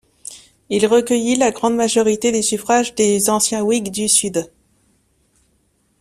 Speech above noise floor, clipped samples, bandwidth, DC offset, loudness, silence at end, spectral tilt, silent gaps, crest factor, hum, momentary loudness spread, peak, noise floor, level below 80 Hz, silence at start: 46 dB; under 0.1%; 15.5 kHz; under 0.1%; -16 LUFS; 1.55 s; -3 dB/octave; none; 18 dB; none; 10 LU; 0 dBFS; -62 dBFS; -56 dBFS; 0.3 s